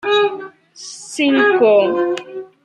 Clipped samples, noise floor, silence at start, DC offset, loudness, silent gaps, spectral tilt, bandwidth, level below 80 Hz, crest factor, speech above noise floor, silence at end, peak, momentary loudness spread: under 0.1%; -37 dBFS; 0.05 s; under 0.1%; -15 LUFS; none; -3.5 dB/octave; 11.5 kHz; -70 dBFS; 14 dB; 23 dB; 0.2 s; -2 dBFS; 20 LU